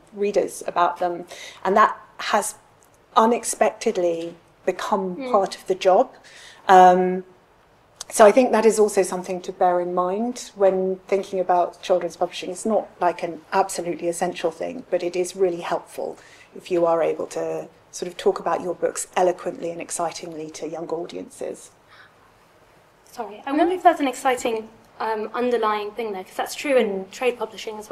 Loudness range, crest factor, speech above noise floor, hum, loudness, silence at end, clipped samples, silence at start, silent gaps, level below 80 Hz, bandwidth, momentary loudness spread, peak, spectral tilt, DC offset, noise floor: 8 LU; 22 dB; 34 dB; none; -22 LUFS; 0.05 s; under 0.1%; 0.15 s; none; -64 dBFS; 14.5 kHz; 15 LU; 0 dBFS; -4 dB/octave; under 0.1%; -56 dBFS